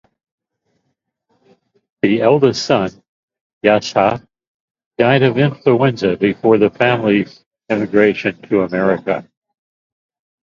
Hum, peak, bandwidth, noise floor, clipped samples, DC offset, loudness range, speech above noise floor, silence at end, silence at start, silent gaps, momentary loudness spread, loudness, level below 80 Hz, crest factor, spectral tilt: none; 0 dBFS; 7.6 kHz; -71 dBFS; under 0.1%; under 0.1%; 4 LU; 57 dB; 1.2 s; 2.05 s; 3.09-3.28 s, 3.41-3.61 s, 4.47-4.75 s, 4.86-4.91 s, 7.46-7.51 s; 9 LU; -15 LUFS; -54 dBFS; 16 dB; -6.5 dB/octave